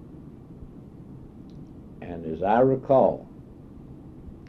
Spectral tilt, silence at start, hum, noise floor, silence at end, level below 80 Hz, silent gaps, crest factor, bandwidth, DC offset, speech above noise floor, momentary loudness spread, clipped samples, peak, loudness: -10 dB/octave; 0.05 s; none; -45 dBFS; 0 s; -52 dBFS; none; 20 dB; 6 kHz; under 0.1%; 23 dB; 25 LU; under 0.1%; -8 dBFS; -23 LUFS